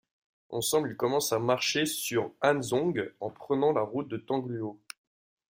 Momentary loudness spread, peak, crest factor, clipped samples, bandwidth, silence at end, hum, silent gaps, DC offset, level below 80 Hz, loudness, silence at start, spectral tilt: 12 LU; -10 dBFS; 20 dB; under 0.1%; 16 kHz; 0.8 s; none; none; under 0.1%; -70 dBFS; -29 LUFS; 0.5 s; -4 dB/octave